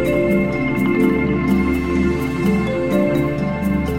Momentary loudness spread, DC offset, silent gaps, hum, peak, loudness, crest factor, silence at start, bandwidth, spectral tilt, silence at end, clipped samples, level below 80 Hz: 3 LU; 0.7%; none; none; -4 dBFS; -18 LUFS; 14 dB; 0 s; 16.5 kHz; -8 dB/octave; 0 s; under 0.1%; -32 dBFS